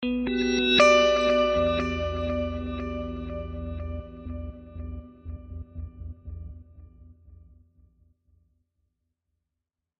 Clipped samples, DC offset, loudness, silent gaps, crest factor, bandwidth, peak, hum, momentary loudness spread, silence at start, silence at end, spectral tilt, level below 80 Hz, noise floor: under 0.1%; under 0.1%; -24 LUFS; none; 22 dB; 8.8 kHz; -6 dBFS; none; 23 LU; 0 s; 2.6 s; -4.5 dB/octave; -42 dBFS; -86 dBFS